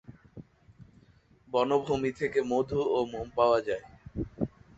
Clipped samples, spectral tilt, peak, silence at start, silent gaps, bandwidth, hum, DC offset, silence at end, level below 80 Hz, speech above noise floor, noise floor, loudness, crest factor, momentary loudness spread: under 0.1%; -6.5 dB/octave; -10 dBFS; 0.1 s; none; 8 kHz; none; under 0.1%; 0.3 s; -54 dBFS; 33 dB; -61 dBFS; -29 LUFS; 20 dB; 13 LU